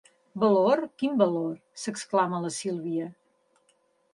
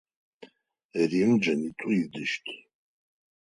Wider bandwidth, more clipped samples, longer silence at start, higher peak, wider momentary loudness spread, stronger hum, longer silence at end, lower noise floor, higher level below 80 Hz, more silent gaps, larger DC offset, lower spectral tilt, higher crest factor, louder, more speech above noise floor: about the same, 11.5 kHz vs 10.5 kHz; neither; about the same, 0.35 s vs 0.4 s; first, -8 dBFS vs -12 dBFS; about the same, 13 LU vs 14 LU; neither; about the same, 1 s vs 0.95 s; first, -68 dBFS vs -62 dBFS; second, -76 dBFS vs -70 dBFS; second, none vs 0.85-0.89 s; neither; about the same, -5.5 dB/octave vs -6 dB/octave; about the same, 20 dB vs 16 dB; about the same, -27 LUFS vs -27 LUFS; first, 42 dB vs 36 dB